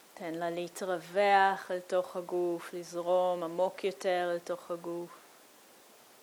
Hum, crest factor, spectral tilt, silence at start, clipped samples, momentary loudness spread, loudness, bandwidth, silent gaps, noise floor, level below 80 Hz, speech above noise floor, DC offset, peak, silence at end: none; 22 dB; -4.5 dB/octave; 0.15 s; under 0.1%; 13 LU; -32 LUFS; 20 kHz; none; -58 dBFS; -88 dBFS; 26 dB; under 0.1%; -12 dBFS; 1.05 s